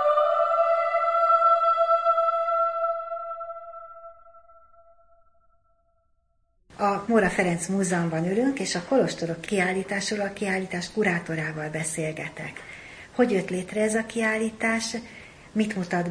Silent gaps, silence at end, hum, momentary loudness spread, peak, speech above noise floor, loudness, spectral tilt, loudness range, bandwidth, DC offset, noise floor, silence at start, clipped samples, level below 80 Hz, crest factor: none; 0 s; none; 15 LU; -8 dBFS; 42 dB; -25 LUFS; -5 dB/octave; 9 LU; 10.5 kHz; under 0.1%; -68 dBFS; 0 s; under 0.1%; -58 dBFS; 18 dB